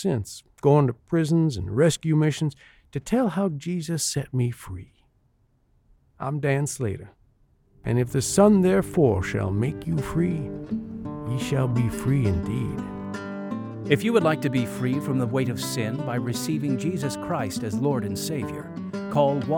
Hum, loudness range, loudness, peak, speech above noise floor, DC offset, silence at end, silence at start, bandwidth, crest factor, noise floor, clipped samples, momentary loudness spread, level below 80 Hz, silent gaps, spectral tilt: none; 6 LU; -25 LUFS; -6 dBFS; 41 dB; under 0.1%; 0 s; 0 s; 18 kHz; 20 dB; -64 dBFS; under 0.1%; 12 LU; -48 dBFS; none; -6 dB/octave